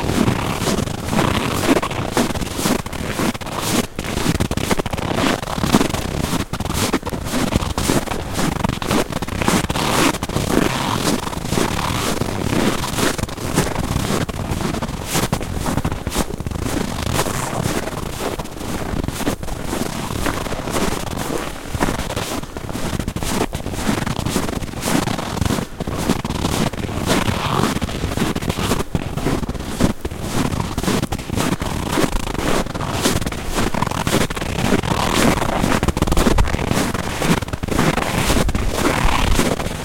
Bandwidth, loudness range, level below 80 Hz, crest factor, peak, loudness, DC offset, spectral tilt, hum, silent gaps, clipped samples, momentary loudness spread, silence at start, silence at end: 17 kHz; 5 LU; -30 dBFS; 20 dB; 0 dBFS; -20 LUFS; under 0.1%; -4.5 dB/octave; none; none; under 0.1%; 6 LU; 0 s; 0 s